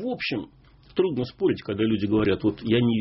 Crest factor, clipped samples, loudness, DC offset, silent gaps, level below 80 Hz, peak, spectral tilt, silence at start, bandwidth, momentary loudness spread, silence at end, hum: 14 dB; under 0.1%; -25 LUFS; under 0.1%; none; -52 dBFS; -10 dBFS; -5.5 dB/octave; 0 s; 5.8 kHz; 8 LU; 0 s; none